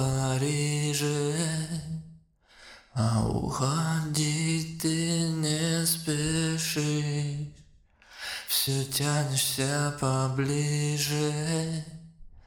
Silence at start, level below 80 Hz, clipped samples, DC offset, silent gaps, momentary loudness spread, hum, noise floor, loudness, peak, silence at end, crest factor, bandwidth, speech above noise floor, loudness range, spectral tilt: 0 s; -52 dBFS; under 0.1%; under 0.1%; none; 9 LU; none; -58 dBFS; -28 LUFS; -12 dBFS; 0.05 s; 18 dB; 19.5 kHz; 30 dB; 3 LU; -4.5 dB/octave